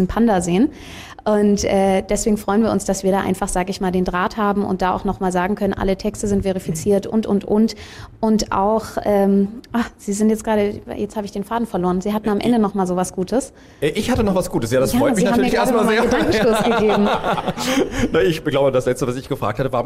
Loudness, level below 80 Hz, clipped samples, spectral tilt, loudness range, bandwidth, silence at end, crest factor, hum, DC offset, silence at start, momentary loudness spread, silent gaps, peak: -19 LUFS; -38 dBFS; under 0.1%; -5.5 dB/octave; 4 LU; 16 kHz; 0 s; 12 dB; none; under 0.1%; 0 s; 7 LU; none; -8 dBFS